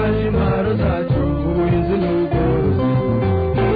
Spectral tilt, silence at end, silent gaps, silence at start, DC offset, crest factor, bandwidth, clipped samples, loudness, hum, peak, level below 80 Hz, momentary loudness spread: -11.5 dB/octave; 0 s; none; 0 s; under 0.1%; 10 dB; 5 kHz; under 0.1%; -18 LUFS; none; -6 dBFS; -28 dBFS; 2 LU